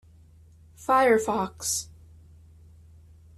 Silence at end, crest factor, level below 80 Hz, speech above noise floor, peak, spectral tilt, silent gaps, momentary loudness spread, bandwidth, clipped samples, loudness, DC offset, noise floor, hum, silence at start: 1.5 s; 20 dB; -58 dBFS; 30 dB; -10 dBFS; -3 dB/octave; none; 16 LU; 14 kHz; under 0.1%; -24 LUFS; under 0.1%; -53 dBFS; none; 0.8 s